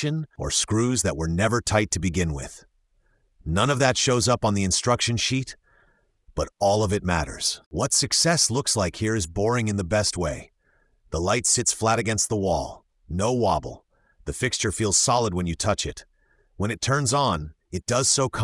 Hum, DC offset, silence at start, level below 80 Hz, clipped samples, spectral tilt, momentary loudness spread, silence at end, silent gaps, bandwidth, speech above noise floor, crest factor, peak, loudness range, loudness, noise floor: none; under 0.1%; 0 s; -44 dBFS; under 0.1%; -3.5 dB/octave; 12 LU; 0 s; 7.66-7.71 s; 12 kHz; 42 dB; 20 dB; -4 dBFS; 3 LU; -23 LUFS; -65 dBFS